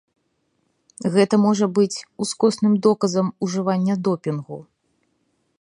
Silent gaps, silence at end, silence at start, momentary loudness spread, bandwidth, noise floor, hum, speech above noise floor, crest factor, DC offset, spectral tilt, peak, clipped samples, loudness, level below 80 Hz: none; 1 s; 1 s; 10 LU; 11.5 kHz; -70 dBFS; none; 50 dB; 18 dB; under 0.1%; -6 dB/octave; -4 dBFS; under 0.1%; -20 LUFS; -70 dBFS